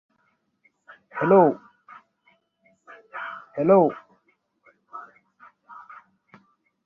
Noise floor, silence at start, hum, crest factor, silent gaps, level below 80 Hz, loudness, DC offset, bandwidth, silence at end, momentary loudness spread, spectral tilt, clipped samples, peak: -70 dBFS; 1.15 s; none; 22 dB; none; -72 dBFS; -21 LUFS; under 0.1%; 3.4 kHz; 1.1 s; 27 LU; -10.5 dB/octave; under 0.1%; -4 dBFS